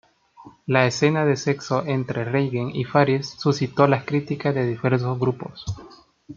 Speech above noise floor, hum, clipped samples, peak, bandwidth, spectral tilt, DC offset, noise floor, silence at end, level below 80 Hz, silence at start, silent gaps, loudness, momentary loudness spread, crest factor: 27 dB; none; under 0.1%; -2 dBFS; 7.4 kHz; -6.5 dB/octave; under 0.1%; -49 dBFS; 0.05 s; -56 dBFS; 0.4 s; none; -22 LUFS; 11 LU; 20 dB